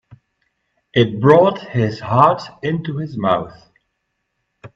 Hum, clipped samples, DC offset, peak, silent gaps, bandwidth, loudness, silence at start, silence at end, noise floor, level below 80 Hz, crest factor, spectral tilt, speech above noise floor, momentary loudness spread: none; under 0.1%; under 0.1%; 0 dBFS; none; 7.6 kHz; -17 LUFS; 0.95 s; 0.1 s; -73 dBFS; -54 dBFS; 18 dB; -8 dB/octave; 57 dB; 11 LU